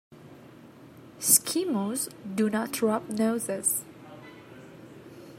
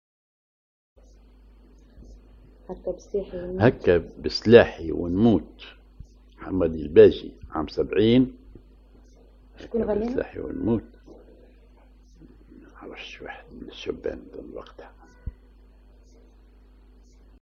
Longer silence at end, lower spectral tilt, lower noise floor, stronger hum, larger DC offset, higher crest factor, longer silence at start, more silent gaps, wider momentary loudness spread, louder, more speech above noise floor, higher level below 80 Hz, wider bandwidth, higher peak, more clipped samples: second, 0 s vs 2.15 s; second, -3 dB/octave vs -7.5 dB/octave; about the same, -50 dBFS vs -52 dBFS; neither; neither; about the same, 26 dB vs 26 dB; second, 0.1 s vs 2 s; neither; about the same, 27 LU vs 27 LU; second, -26 LUFS vs -23 LUFS; second, 22 dB vs 30 dB; second, -74 dBFS vs -46 dBFS; first, 16 kHz vs 7 kHz; second, -4 dBFS vs 0 dBFS; neither